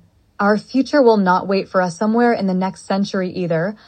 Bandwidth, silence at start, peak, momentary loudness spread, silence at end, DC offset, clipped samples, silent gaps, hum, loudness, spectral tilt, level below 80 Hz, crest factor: 8.8 kHz; 0.4 s; -2 dBFS; 8 LU; 0.15 s; under 0.1%; under 0.1%; none; none; -17 LUFS; -6.5 dB/octave; -62 dBFS; 16 dB